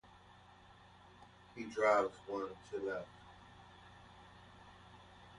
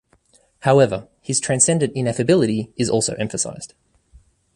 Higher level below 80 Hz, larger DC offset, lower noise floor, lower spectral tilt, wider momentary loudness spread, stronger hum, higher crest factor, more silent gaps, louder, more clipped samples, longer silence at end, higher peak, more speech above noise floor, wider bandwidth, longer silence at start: second, -70 dBFS vs -54 dBFS; neither; first, -62 dBFS vs -58 dBFS; about the same, -5 dB/octave vs -4.5 dB/octave; first, 28 LU vs 10 LU; neither; about the same, 24 dB vs 20 dB; neither; second, -38 LUFS vs -19 LUFS; neither; second, 0 s vs 0.9 s; second, -18 dBFS vs 0 dBFS; second, 24 dB vs 39 dB; about the same, 11 kHz vs 11.5 kHz; second, 0.15 s vs 0.65 s